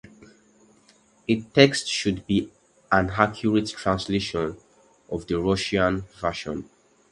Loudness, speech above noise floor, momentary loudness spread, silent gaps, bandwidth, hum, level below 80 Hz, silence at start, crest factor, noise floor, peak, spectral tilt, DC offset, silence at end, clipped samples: -24 LUFS; 35 dB; 15 LU; none; 11.5 kHz; none; -48 dBFS; 0.2 s; 26 dB; -59 dBFS; 0 dBFS; -5 dB/octave; under 0.1%; 0.5 s; under 0.1%